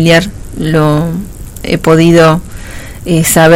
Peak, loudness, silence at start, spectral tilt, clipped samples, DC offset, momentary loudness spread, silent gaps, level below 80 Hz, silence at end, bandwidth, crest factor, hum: 0 dBFS; -9 LUFS; 0 s; -5 dB/octave; 2%; under 0.1%; 20 LU; none; -28 dBFS; 0 s; 16.5 kHz; 8 dB; none